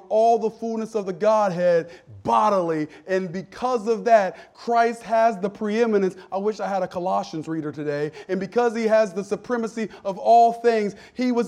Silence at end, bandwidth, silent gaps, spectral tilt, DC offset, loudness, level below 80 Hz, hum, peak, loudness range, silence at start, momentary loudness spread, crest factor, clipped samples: 0 s; 10.5 kHz; none; -6 dB/octave; under 0.1%; -22 LUFS; -66 dBFS; none; -4 dBFS; 3 LU; 0.1 s; 10 LU; 18 dB; under 0.1%